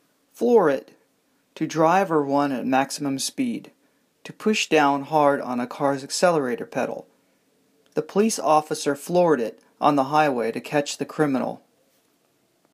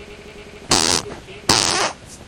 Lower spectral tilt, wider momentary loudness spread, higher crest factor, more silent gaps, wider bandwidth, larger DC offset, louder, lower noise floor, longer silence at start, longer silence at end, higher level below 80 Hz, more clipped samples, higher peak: first, -4.5 dB/octave vs -1.5 dB/octave; second, 10 LU vs 23 LU; about the same, 18 dB vs 22 dB; neither; second, 15.5 kHz vs over 20 kHz; neither; second, -22 LUFS vs -17 LUFS; first, -66 dBFS vs -38 dBFS; first, 0.4 s vs 0 s; first, 1.15 s vs 0.05 s; second, -76 dBFS vs -44 dBFS; neither; second, -4 dBFS vs 0 dBFS